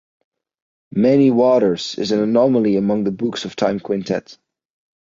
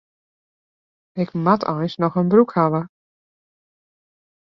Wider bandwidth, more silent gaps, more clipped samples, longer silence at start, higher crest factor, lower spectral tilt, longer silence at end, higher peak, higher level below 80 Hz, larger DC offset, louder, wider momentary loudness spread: first, 7.6 kHz vs 6 kHz; neither; neither; second, 0.95 s vs 1.15 s; second, 14 dB vs 20 dB; second, -6.5 dB/octave vs -9.5 dB/octave; second, 0.7 s vs 1.6 s; about the same, -4 dBFS vs -2 dBFS; first, -58 dBFS vs -64 dBFS; neither; about the same, -17 LUFS vs -19 LUFS; about the same, 10 LU vs 11 LU